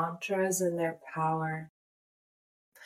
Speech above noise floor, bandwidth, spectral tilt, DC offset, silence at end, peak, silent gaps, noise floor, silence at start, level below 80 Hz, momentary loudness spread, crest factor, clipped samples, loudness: over 58 dB; 16 kHz; -5 dB/octave; under 0.1%; 0 s; -18 dBFS; 1.69-2.72 s; under -90 dBFS; 0 s; -78 dBFS; 9 LU; 16 dB; under 0.1%; -32 LUFS